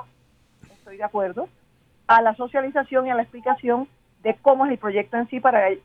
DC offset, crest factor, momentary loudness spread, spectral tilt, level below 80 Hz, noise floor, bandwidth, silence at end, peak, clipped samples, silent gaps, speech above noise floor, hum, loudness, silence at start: under 0.1%; 20 dB; 13 LU; -7 dB/octave; -64 dBFS; -60 dBFS; 5.6 kHz; 0.05 s; -2 dBFS; under 0.1%; none; 39 dB; none; -21 LUFS; 0.85 s